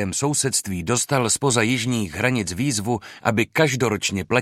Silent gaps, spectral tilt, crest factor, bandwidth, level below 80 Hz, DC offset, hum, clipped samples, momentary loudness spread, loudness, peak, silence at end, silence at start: none; -4 dB/octave; 20 dB; 16 kHz; -52 dBFS; under 0.1%; none; under 0.1%; 5 LU; -21 LUFS; -2 dBFS; 0 s; 0 s